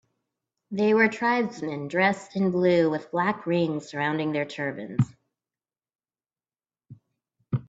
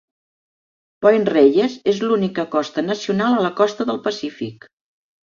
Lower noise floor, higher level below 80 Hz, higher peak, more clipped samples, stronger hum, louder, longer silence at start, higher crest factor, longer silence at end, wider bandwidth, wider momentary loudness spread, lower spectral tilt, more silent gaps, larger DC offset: about the same, under -90 dBFS vs under -90 dBFS; about the same, -68 dBFS vs -64 dBFS; second, -6 dBFS vs -2 dBFS; neither; neither; second, -25 LUFS vs -18 LUFS; second, 0.7 s vs 1 s; about the same, 20 dB vs 18 dB; second, 0.05 s vs 0.8 s; about the same, 8 kHz vs 7.4 kHz; about the same, 9 LU vs 11 LU; about the same, -7 dB/octave vs -6 dB/octave; first, 5.95-5.99 s vs none; neither